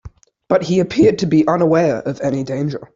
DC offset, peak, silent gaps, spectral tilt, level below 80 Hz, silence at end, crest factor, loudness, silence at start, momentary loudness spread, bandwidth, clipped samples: under 0.1%; 0 dBFS; none; -7 dB/octave; -48 dBFS; 0.1 s; 16 dB; -16 LUFS; 0.05 s; 8 LU; 7.6 kHz; under 0.1%